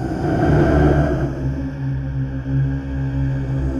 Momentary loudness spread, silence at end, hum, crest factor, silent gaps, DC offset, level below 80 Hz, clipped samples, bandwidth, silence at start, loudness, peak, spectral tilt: 9 LU; 0 s; none; 16 dB; none; under 0.1%; -26 dBFS; under 0.1%; 7 kHz; 0 s; -20 LUFS; -4 dBFS; -9 dB/octave